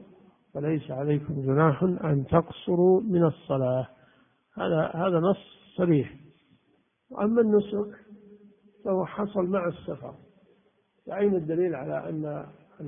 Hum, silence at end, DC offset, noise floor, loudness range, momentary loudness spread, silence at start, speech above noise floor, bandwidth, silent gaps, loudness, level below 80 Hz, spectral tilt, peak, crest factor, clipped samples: none; 0 s; under 0.1%; -69 dBFS; 6 LU; 16 LU; 0 s; 43 dB; 3.7 kHz; none; -27 LUFS; -60 dBFS; -12.5 dB/octave; -6 dBFS; 22 dB; under 0.1%